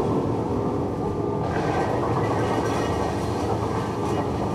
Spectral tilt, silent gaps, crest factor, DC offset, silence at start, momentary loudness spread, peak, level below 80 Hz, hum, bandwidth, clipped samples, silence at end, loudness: -7 dB/octave; none; 14 dB; under 0.1%; 0 s; 3 LU; -10 dBFS; -40 dBFS; none; 14 kHz; under 0.1%; 0 s; -25 LUFS